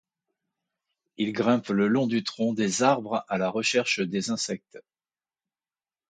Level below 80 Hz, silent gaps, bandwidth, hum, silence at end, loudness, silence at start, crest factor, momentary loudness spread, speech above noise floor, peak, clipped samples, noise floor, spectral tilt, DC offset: -72 dBFS; none; 9.4 kHz; none; 1.3 s; -26 LUFS; 1.2 s; 20 dB; 7 LU; over 64 dB; -6 dBFS; under 0.1%; under -90 dBFS; -4 dB/octave; under 0.1%